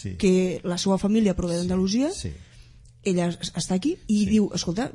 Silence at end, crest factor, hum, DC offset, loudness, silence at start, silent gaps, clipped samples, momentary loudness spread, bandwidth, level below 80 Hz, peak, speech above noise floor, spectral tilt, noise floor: 0 s; 16 dB; none; under 0.1%; -24 LUFS; 0 s; none; under 0.1%; 8 LU; 11.5 kHz; -44 dBFS; -8 dBFS; 26 dB; -5.5 dB/octave; -49 dBFS